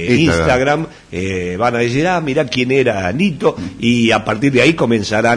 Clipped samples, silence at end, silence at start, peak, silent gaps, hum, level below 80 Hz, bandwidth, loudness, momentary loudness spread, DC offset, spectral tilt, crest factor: under 0.1%; 0 s; 0 s; 0 dBFS; none; none; -38 dBFS; 10.5 kHz; -15 LUFS; 8 LU; under 0.1%; -5.5 dB/octave; 14 dB